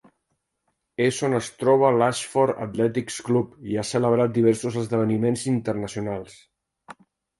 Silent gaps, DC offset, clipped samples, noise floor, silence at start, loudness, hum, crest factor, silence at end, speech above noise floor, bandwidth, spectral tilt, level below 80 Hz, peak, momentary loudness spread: none; under 0.1%; under 0.1%; -76 dBFS; 1 s; -23 LUFS; none; 18 dB; 0.45 s; 54 dB; 11.5 kHz; -6 dB/octave; -60 dBFS; -6 dBFS; 10 LU